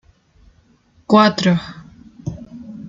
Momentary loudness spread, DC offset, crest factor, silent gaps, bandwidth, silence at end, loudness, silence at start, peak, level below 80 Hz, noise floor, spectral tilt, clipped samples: 23 LU; under 0.1%; 18 dB; none; 7.6 kHz; 0 s; -15 LUFS; 1.1 s; -2 dBFS; -50 dBFS; -55 dBFS; -6 dB/octave; under 0.1%